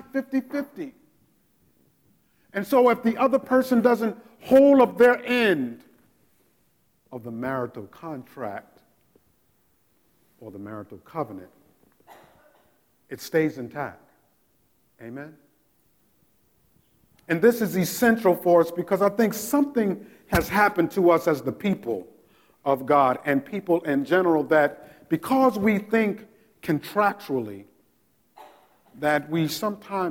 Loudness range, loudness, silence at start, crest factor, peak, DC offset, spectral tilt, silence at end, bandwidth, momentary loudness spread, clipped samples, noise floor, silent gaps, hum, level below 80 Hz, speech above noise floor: 19 LU; -23 LUFS; 0.15 s; 20 dB; -6 dBFS; under 0.1%; -6 dB/octave; 0 s; 17.5 kHz; 19 LU; under 0.1%; -67 dBFS; none; none; -56 dBFS; 44 dB